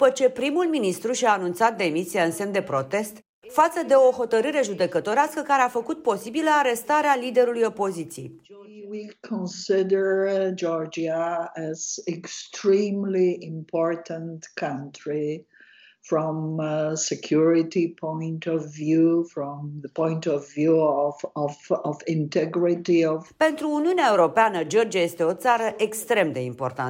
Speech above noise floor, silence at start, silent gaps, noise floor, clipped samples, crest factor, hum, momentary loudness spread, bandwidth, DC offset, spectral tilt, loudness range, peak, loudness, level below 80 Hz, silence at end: 30 dB; 0 s; 3.29-3.42 s; -53 dBFS; under 0.1%; 16 dB; none; 11 LU; 16 kHz; under 0.1%; -5 dB/octave; 5 LU; -6 dBFS; -24 LUFS; -72 dBFS; 0 s